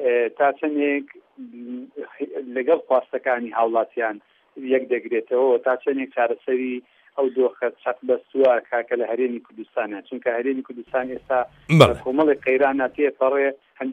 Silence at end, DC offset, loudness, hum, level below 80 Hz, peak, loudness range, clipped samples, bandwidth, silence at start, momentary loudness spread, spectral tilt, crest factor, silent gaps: 0 s; under 0.1%; -22 LUFS; none; -56 dBFS; 0 dBFS; 4 LU; under 0.1%; 12.5 kHz; 0 s; 13 LU; -7 dB/octave; 22 dB; none